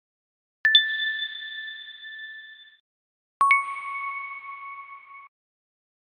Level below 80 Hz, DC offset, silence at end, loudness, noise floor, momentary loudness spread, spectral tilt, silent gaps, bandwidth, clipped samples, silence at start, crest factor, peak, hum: -80 dBFS; under 0.1%; 0.9 s; -23 LUFS; under -90 dBFS; 23 LU; 2.5 dB/octave; 2.80-3.40 s; 14.5 kHz; under 0.1%; 0.65 s; 24 dB; -4 dBFS; none